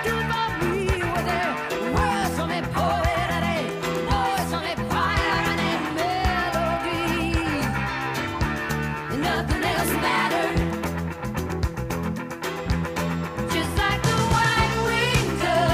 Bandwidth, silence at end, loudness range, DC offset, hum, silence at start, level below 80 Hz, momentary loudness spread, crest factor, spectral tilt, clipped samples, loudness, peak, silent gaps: 15.5 kHz; 0 s; 2 LU; under 0.1%; none; 0 s; -34 dBFS; 6 LU; 14 dB; -5 dB/octave; under 0.1%; -24 LUFS; -10 dBFS; none